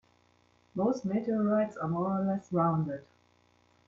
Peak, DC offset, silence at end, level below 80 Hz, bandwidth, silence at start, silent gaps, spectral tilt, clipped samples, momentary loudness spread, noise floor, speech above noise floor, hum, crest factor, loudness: -16 dBFS; under 0.1%; 0.85 s; -70 dBFS; 7.2 kHz; 0.75 s; none; -9 dB/octave; under 0.1%; 7 LU; -67 dBFS; 37 dB; 60 Hz at -55 dBFS; 16 dB; -31 LUFS